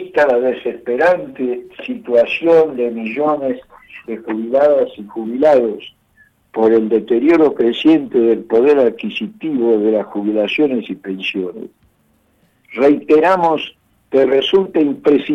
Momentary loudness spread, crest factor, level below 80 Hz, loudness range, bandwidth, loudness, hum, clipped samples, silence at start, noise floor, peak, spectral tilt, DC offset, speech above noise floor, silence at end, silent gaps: 14 LU; 12 dB; -58 dBFS; 4 LU; 7 kHz; -15 LUFS; none; under 0.1%; 0 s; -58 dBFS; -4 dBFS; -6.5 dB/octave; under 0.1%; 44 dB; 0 s; none